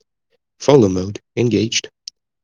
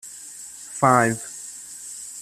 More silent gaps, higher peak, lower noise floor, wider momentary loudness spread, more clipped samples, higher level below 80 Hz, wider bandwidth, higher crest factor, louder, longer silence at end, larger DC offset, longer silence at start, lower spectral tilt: neither; about the same, 0 dBFS vs -2 dBFS; first, -70 dBFS vs -40 dBFS; first, 22 LU vs 19 LU; neither; about the same, -60 dBFS vs -62 dBFS; second, 10 kHz vs 15 kHz; about the same, 18 dB vs 22 dB; first, -17 LUFS vs -21 LUFS; first, 0.55 s vs 0 s; neither; first, 0.6 s vs 0.05 s; about the same, -5 dB/octave vs -4.5 dB/octave